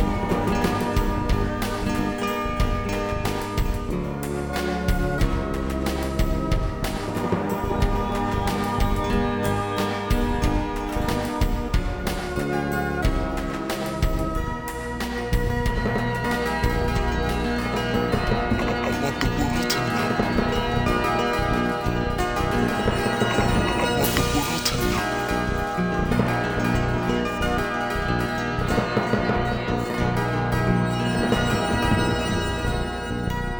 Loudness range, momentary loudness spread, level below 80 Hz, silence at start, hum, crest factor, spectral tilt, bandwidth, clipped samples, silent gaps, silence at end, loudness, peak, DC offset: 3 LU; 5 LU; -30 dBFS; 0 s; none; 18 dB; -5.5 dB/octave; over 20 kHz; under 0.1%; none; 0 s; -24 LUFS; -4 dBFS; under 0.1%